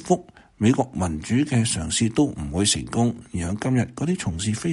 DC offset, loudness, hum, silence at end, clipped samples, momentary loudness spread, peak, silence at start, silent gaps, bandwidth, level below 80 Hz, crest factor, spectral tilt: under 0.1%; -23 LUFS; none; 0 s; under 0.1%; 5 LU; -6 dBFS; 0 s; none; 11.5 kHz; -42 dBFS; 18 dB; -5 dB/octave